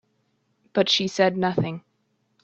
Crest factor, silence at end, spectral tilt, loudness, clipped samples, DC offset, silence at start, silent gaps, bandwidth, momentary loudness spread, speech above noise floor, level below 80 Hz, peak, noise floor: 20 dB; 0.65 s; -4.5 dB/octave; -23 LUFS; under 0.1%; under 0.1%; 0.75 s; none; 8.2 kHz; 10 LU; 48 dB; -64 dBFS; -6 dBFS; -70 dBFS